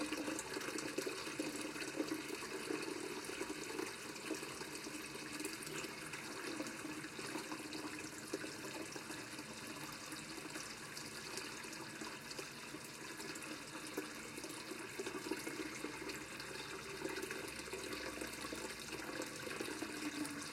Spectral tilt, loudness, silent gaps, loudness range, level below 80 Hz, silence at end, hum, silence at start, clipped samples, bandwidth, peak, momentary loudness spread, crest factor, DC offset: -2.5 dB/octave; -45 LUFS; none; 3 LU; -72 dBFS; 0 s; none; 0 s; under 0.1%; 16.5 kHz; -26 dBFS; 5 LU; 20 dB; under 0.1%